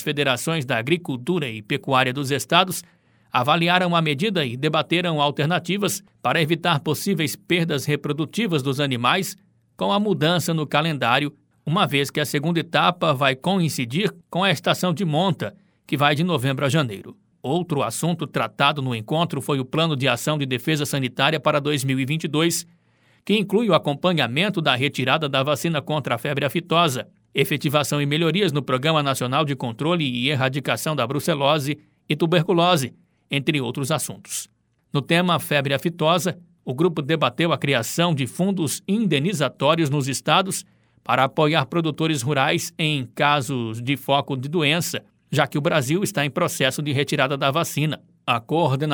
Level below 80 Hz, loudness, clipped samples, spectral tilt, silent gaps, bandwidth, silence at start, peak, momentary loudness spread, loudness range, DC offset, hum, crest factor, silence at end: -64 dBFS; -21 LUFS; under 0.1%; -4.5 dB/octave; none; over 20 kHz; 0 s; -2 dBFS; 6 LU; 2 LU; under 0.1%; none; 20 dB; 0 s